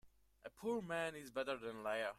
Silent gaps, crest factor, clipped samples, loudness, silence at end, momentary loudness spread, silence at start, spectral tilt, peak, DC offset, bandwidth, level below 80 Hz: none; 16 dB; under 0.1%; -44 LUFS; 0 s; 11 LU; 0.05 s; -4.5 dB/octave; -28 dBFS; under 0.1%; 15.5 kHz; -76 dBFS